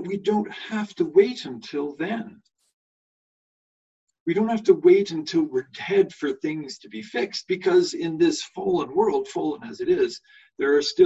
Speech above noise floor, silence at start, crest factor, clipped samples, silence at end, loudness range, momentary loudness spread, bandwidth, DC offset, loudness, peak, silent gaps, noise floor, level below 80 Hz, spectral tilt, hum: over 67 dB; 0 s; 18 dB; under 0.1%; 0 s; 5 LU; 12 LU; 8 kHz; under 0.1%; -24 LUFS; -4 dBFS; 2.73-4.07 s, 4.20-4.26 s; under -90 dBFS; -66 dBFS; -5 dB/octave; none